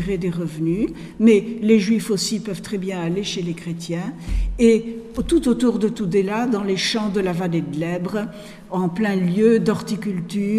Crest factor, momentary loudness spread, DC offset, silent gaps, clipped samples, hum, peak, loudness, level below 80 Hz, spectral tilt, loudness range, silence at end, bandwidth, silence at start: 16 dB; 11 LU; under 0.1%; none; under 0.1%; none; -4 dBFS; -21 LUFS; -36 dBFS; -6 dB/octave; 2 LU; 0 s; 14 kHz; 0 s